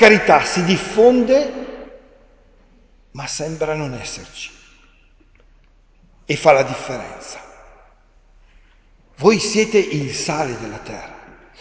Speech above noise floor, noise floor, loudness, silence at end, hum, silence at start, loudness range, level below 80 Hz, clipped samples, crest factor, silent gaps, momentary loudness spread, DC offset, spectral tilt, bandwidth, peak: 35 dB; -52 dBFS; -17 LUFS; 0.4 s; none; 0 s; 9 LU; -48 dBFS; under 0.1%; 20 dB; none; 21 LU; under 0.1%; -4.5 dB/octave; 8 kHz; 0 dBFS